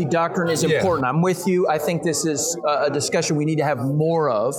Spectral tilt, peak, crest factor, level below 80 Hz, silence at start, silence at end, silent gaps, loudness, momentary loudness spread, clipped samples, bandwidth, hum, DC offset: -5 dB/octave; -6 dBFS; 14 dB; -58 dBFS; 0 s; 0 s; none; -20 LUFS; 2 LU; under 0.1%; 19 kHz; none; under 0.1%